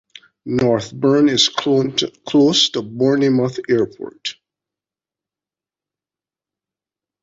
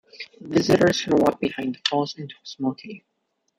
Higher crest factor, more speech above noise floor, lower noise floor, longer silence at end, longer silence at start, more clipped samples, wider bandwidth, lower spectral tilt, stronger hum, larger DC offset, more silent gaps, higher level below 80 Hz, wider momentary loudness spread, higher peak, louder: about the same, 18 dB vs 20 dB; first, over 73 dB vs 52 dB; first, under -90 dBFS vs -74 dBFS; first, 2.9 s vs 0.6 s; first, 0.45 s vs 0.15 s; neither; second, 8 kHz vs 16 kHz; about the same, -4.5 dB/octave vs -5 dB/octave; neither; neither; neither; about the same, -58 dBFS vs -56 dBFS; second, 14 LU vs 20 LU; about the same, -2 dBFS vs -4 dBFS; first, -16 LUFS vs -22 LUFS